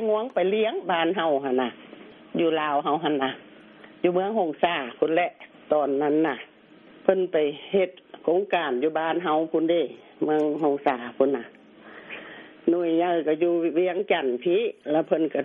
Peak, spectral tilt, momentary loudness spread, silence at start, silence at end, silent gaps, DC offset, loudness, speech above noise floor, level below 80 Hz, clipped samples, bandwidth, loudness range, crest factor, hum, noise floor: -4 dBFS; -3.5 dB/octave; 8 LU; 0 s; 0 s; none; under 0.1%; -25 LUFS; 27 dB; -74 dBFS; under 0.1%; 4 kHz; 2 LU; 22 dB; none; -51 dBFS